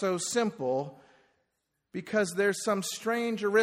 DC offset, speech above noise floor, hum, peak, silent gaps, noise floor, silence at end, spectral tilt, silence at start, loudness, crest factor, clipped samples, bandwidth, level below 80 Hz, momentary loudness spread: under 0.1%; 52 dB; none; -12 dBFS; none; -81 dBFS; 0 s; -4 dB/octave; 0 s; -30 LUFS; 18 dB; under 0.1%; 15 kHz; -76 dBFS; 11 LU